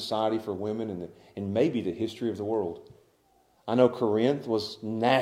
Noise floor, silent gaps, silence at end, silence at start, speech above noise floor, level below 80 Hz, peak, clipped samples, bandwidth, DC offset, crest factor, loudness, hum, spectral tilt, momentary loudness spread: -65 dBFS; none; 0 s; 0 s; 38 dB; -70 dBFS; -6 dBFS; under 0.1%; 15 kHz; under 0.1%; 22 dB; -28 LUFS; none; -6.5 dB/octave; 13 LU